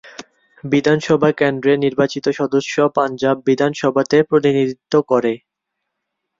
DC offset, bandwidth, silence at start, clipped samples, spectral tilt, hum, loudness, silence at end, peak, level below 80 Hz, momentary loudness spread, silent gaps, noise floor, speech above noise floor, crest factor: under 0.1%; 7.6 kHz; 0.05 s; under 0.1%; -6 dB/octave; none; -17 LUFS; 1.05 s; -2 dBFS; -58 dBFS; 5 LU; none; -78 dBFS; 62 dB; 16 dB